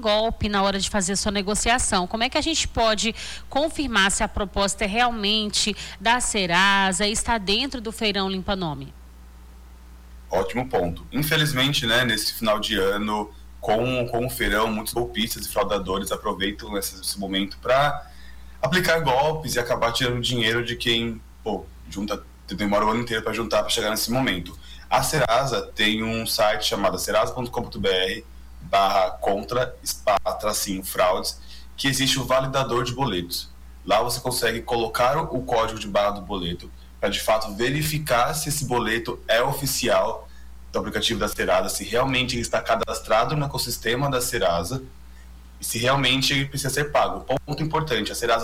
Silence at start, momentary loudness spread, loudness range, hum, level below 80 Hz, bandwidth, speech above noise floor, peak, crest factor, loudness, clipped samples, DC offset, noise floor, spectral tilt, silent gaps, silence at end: 0 s; 9 LU; 3 LU; none; -40 dBFS; 19 kHz; 21 dB; -8 dBFS; 16 dB; -23 LUFS; under 0.1%; under 0.1%; -44 dBFS; -3.5 dB/octave; none; 0 s